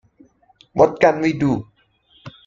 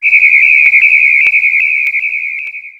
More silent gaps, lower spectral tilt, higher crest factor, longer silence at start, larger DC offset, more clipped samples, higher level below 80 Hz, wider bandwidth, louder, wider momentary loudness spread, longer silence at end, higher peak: neither; first, -7 dB/octave vs 0.5 dB/octave; first, 20 dB vs 10 dB; first, 0.75 s vs 0 s; neither; neither; first, -52 dBFS vs -60 dBFS; second, 7.6 kHz vs 10 kHz; second, -18 LUFS vs -6 LUFS; about the same, 11 LU vs 11 LU; about the same, 0.15 s vs 0.1 s; about the same, 0 dBFS vs 0 dBFS